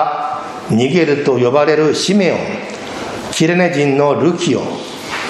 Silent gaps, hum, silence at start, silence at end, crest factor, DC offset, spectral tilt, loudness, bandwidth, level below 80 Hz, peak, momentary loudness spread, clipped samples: none; none; 0 s; 0 s; 14 dB; under 0.1%; -5 dB/octave; -15 LUFS; 13.5 kHz; -52 dBFS; 0 dBFS; 12 LU; under 0.1%